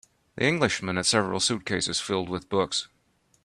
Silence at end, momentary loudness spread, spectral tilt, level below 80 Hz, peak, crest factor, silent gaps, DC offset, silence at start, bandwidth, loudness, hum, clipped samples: 0.6 s; 7 LU; -3 dB/octave; -60 dBFS; -6 dBFS; 20 dB; none; under 0.1%; 0.35 s; 13 kHz; -26 LUFS; none; under 0.1%